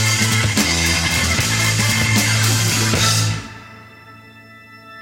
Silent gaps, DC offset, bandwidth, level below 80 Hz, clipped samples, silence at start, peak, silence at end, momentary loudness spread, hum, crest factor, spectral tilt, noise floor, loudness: none; under 0.1%; 17 kHz; -36 dBFS; under 0.1%; 0 s; 0 dBFS; 0 s; 5 LU; none; 18 dB; -3 dB/octave; -42 dBFS; -15 LUFS